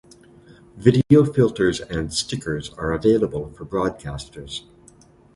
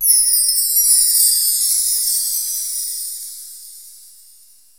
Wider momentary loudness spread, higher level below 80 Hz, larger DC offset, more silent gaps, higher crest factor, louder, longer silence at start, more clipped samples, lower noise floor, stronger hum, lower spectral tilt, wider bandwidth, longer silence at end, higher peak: about the same, 17 LU vs 18 LU; first, -44 dBFS vs -56 dBFS; second, under 0.1% vs 0.3%; neither; about the same, 22 dB vs 18 dB; second, -21 LUFS vs -13 LUFS; first, 0.75 s vs 0 s; neither; about the same, -51 dBFS vs -48 dBFS; neither; first, -6 dB/octave vs 6.5 dB/octave; second, 11.5 kHz vs over 20 kHz; about the same, 0.75 s vs 0.85 s; about the same, 0 dBFS vs 0 dBFS